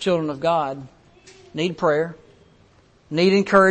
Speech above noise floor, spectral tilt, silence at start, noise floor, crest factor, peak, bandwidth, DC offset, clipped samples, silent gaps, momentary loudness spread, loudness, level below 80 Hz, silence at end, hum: 36 dB; -6 dB/octave; 0 s; -55 dBFS; 18 dB; -4 dBFS; 8.8 kHz; under 0.1%; under 0.1%; none; 14 LU; -21 LUFS; -58 dBFS; 0 s; none